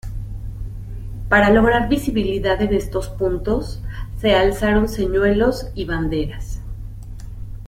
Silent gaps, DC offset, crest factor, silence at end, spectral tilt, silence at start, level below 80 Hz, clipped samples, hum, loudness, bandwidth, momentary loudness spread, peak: none; under 0.1%; 18 dB; 0 s; -6.5 dB/octave; 0.05 s; -28 dBFS; under 0.1%; none; -19 LUFS; 16 kHz; 18 LU; -2 dBFS